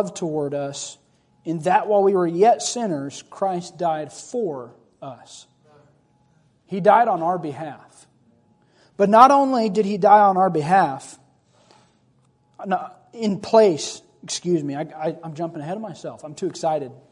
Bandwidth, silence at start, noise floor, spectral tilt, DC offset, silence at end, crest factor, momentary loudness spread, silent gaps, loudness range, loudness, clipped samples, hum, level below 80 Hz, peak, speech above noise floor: 11 kHz; 0 s; -61 dBFS; -5 dB/octave; under 0.1%; 0.2 s; 22 dB; 21 LU; none; 10 LU; -20 LUFS; under 0.1%; none; -70 dBFS; 0 dBFS; 41 dB